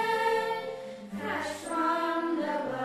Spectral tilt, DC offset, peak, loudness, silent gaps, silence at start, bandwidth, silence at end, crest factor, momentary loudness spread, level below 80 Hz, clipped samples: -4 dB/octave; under 0.1%; -16 dBFS; -31 LUFS; none; 0 s; 13 kHz; 0 s; 14 dB; 11 LU; -72 dBFS; under 0.1%